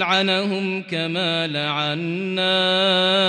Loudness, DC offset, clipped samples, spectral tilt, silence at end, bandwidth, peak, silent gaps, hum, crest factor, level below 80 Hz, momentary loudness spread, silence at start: -20 LUFS; under 0.1%; under 0.1%; -5 dB/octave; 0 s; 10 kHz; -6 dBFS; none; none; 14 dB; -70 dBFS; 8 LU; 0 s